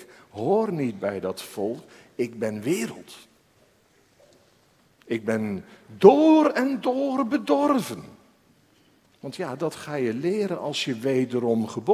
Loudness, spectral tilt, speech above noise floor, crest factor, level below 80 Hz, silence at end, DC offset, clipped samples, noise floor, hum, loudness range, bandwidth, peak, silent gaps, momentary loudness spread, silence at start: -24 LUFS; -6 dB/octave; 38 dB; 24 dB; -66 dBFS; 0 s; under 0.1%; under 0.1%; -61 dBFS; none; 11 LU; 16 kHz; 0 dBFS; none; 17 LU; 0 s